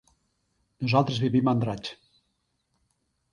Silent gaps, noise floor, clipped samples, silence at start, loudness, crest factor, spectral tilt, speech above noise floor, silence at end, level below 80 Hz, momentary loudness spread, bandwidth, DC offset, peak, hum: none; -76 dBFS; under 0.1%; 0.8 s; -26 LUFS; 22 dB; -7.5 dB/octave; 51 dB; 1.4 s; -62 dBFS; 12 LU; 10.5 kHz; under 0.1%; -6 dBFS; none